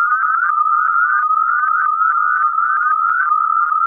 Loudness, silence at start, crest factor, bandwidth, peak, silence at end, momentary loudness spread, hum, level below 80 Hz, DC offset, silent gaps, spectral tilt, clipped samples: -14 LUFS; 0 s; 10 dB; 2.6 kHz; -6 dBFS; 0 s; 1 LU; none; -80 dBFS; under 0.1%; none; -2.5 dB/octave; under 0.1%